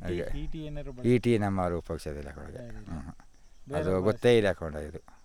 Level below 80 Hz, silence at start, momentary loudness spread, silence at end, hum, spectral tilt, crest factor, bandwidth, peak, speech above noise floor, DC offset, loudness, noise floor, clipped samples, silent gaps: -44 dBFS; 0 s; 19 LU; 0.25 s; none; -7 dB/octave; 18 dB; 15.5 kHz; -12 dBFS; 22 dB; under 0.1%; -29 LUFS; -51 dBFS; under 0.1%; none